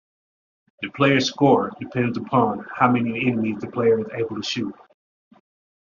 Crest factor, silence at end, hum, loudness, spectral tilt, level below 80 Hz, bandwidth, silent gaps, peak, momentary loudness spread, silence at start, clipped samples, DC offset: 20 dB; 1.15 s; none; -21 LUFS; -4.5 dB/octave; -62 dBFS; 7.2 kHz; none; -4 dBFS; 9 LU; 0.8 s; under 0.1%; under 0.1%